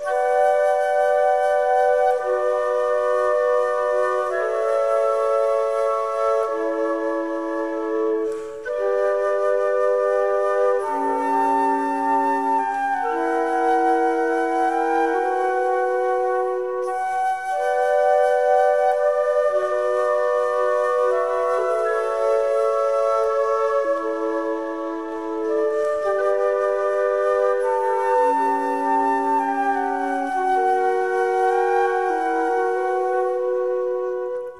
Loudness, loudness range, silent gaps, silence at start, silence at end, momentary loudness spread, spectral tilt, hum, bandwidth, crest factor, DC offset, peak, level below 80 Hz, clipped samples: -21 LUFS; 3 LU; none; 0 s; 0 s; 5 LU; -3.5 dB/octave; none; 12 kHz; 12 dB; 0.3%; -8 dBFS; -62 dBFS; under 0.1%